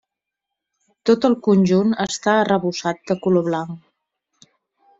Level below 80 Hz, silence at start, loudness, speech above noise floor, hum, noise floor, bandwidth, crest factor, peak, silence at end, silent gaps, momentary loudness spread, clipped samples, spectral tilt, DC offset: -60 dBFS; 1.05 s; -19 LUFS; 65 dB; none; -83 dBFS; 7.8 kHz; 18 dB; -4 dBFS; 1.2 s; none; 9 LU; under 0.1%; -6 dB/octave; under 0.1%